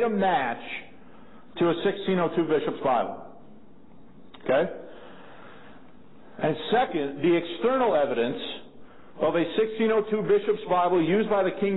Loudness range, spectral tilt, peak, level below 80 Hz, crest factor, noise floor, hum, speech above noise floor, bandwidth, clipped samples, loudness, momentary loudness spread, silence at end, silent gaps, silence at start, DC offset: 6 LU; -10.5 dB/octave; -12 dBFS; -64 dBFS; 14 dB; -52 dBFS; none; 28 dB; 4.1 kHz; under 0.1%; -25 LUFS; 13 LU; 0 s; none; 0 s; 0.6%